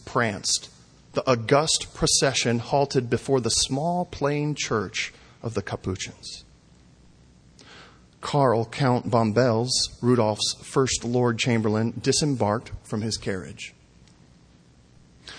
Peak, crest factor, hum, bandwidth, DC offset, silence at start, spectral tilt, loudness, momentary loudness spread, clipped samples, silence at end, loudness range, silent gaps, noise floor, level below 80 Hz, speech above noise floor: -6 dBFS; 20 dB; none; 10.5 kHz; under 0.1%; 0.05 s; -4 dB/octave; -24 LUFS; 12 LU; under 0.1%; 0 s; 8 LU; none; -55 dBFS; -52 dBFS; 31 dB